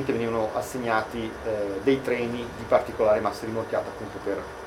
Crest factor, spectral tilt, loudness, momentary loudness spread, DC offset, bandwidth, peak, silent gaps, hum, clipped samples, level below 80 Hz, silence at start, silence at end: 20 dB; -5.5 dB/octave; -27 LUFS; 9 LU; under 0.1%; 17 kHz; -6 dBFS; none; none; under 0.1%; -52 dBFS; 0 s; 0 s